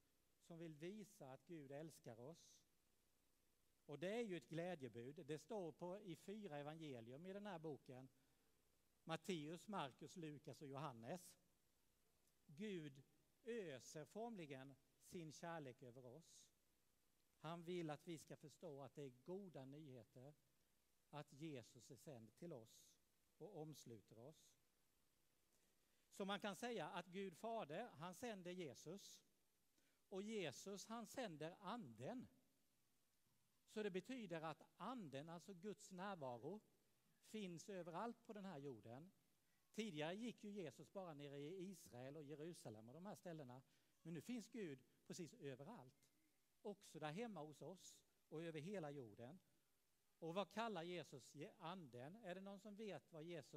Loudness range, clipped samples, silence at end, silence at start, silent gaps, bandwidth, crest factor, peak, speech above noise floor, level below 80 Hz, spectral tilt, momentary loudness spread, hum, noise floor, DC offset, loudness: 7 LU; under 0.1%; 0 s; 0.45 s; none; 15.5 kHz; 24 dB; -32 dBFS; 32 dB; under -90 dBFS; -5 dB/octave; 12 LU; none; -87 dBFS; under 0.1%; -56 LUFS